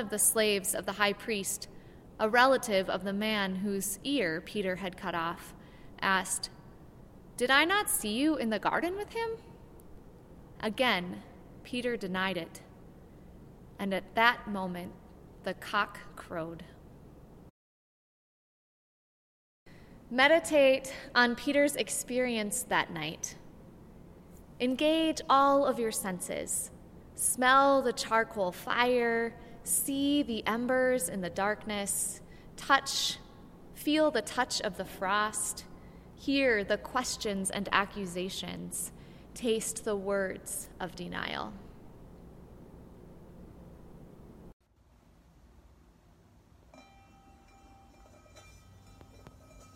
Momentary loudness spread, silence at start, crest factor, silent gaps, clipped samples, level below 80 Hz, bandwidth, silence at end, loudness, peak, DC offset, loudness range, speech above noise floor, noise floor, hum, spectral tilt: 16 LU; 0 s; 24 dB; 17.50-19.66 s, 44.53-44.60 s; under 0.1%; -58 dBFS; 16.5 kHz; 0.1 s; -30 LUFS; -8 dBFS; under 0.1%; 10 LU; 33 dB; -63 dBFS; none; -2.5 dB/octave